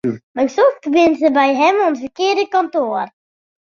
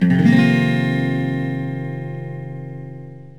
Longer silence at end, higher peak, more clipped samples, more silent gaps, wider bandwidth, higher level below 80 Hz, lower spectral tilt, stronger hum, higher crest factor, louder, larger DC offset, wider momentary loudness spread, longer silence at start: first, 0.7 s vs 0.05 s; about the same, -2 dBFS vs -2 dBFS; neither; first, 0.23-0.34 s vs none; second, 7.2 kHz vs 10.5 kHz; second, -62 dBFS vs -56 dBFS; second, -4.5 dB/octave vs -8 dB/octave; neither; about the same, 14 dB vs 18 dB; about the same, -16 LUFS vs -18 LUFS; second, under 0.1% vs 0.6%; second, 8 LU vs 19 LU; about the same, 0.05 s vs 0 s